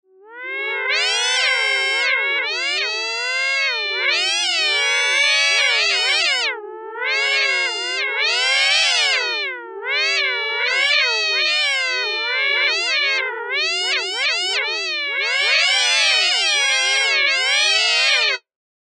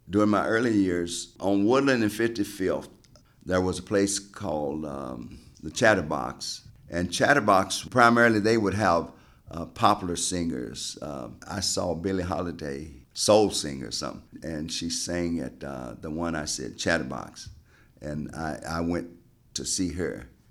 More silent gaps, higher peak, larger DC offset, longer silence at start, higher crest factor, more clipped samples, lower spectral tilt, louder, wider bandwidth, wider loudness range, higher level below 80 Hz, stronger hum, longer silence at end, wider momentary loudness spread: neither; about the same, -6 dBFS vs -4 dBFS; neither; first, 0.25 s vs 0.05 s; second, 14 dB vs 22 dB; neither; second, 6 dB/octave vs -4 dB/octave; first, -16 LUFS vs -26 LUFS; second, 11.5 kHz vs 15.5 kHz; second, 3 LU vs 9 LU; second, under -90 dBFS vs -52 dBFS; neither; first, 0.6 s vs 0.25 s; second, 7 LU vs 17 LU